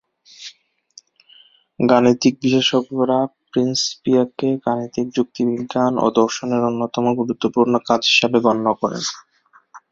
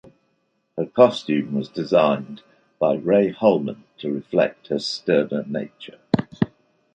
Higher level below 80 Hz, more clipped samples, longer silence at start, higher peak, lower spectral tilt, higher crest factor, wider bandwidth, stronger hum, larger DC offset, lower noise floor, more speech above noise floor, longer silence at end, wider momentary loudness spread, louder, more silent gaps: about the same, -60 dBFS vs -60 dBFS; neither; second, 0.4 s vs 0.75 s; about the same, -2 dBFS vs -2 dBFS; second, -4.5 dB/octave vs -6.5 dB/octave; about the same, 18 dB vs 20 dB; second, 7.6 kHz vs 9 kHz; neither; neither; second, -53 dBFS vs -69 dBFS; second, 35 dB vs 49 dB; second, 0.15 s vs 0.5 s; second, 9 LU vs 15 LU; first, -18 LUFS vs -22 LUFS; neither